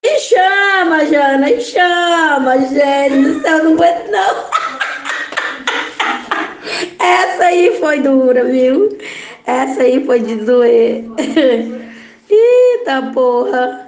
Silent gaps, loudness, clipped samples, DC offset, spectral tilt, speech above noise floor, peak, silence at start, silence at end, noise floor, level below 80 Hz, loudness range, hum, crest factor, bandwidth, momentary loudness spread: none; -12 LUFS; under 0.1%; under 0.1%; -3.5 dB/octave; 22 dB; 0 dBFS; 0.05 s; 0 s; -33 dBFS; -60 dBFS; 4 LU; none; 12 dB; 9.6 kHz; 9 LU